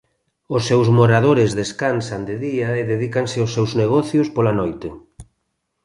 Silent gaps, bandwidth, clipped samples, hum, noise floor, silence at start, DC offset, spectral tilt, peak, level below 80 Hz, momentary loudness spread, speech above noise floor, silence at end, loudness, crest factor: none; 11.5 kHz; under 0.1%; none; -73 dBFS; 0.5 s; under 0.1%; -6.5 dB/octave; -2 dBFS; -50 dBFS; 11 LU; 56 dB; 0.6 s; -18 LUFS; 16 dB